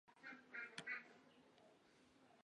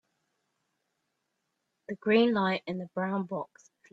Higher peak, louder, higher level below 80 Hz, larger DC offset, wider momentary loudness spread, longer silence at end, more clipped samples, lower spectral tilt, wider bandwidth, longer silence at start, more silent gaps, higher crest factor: second, -34 dBFS vs -12 dBFS; second, -52 LUFS vs -29 LUFS; second, under -90 dBFS vs -76 dBFS; neither; about the same, 16 LU vs 15 LU; second, 0 s vs 0.45 s; neither; second, -2.5 dB/octave vs -7 dB/octave; first, 10 kHz vs 7.6 kHz; second, 0.05 s vs 1.9 s; neither; first, 26 dB vs 20 dB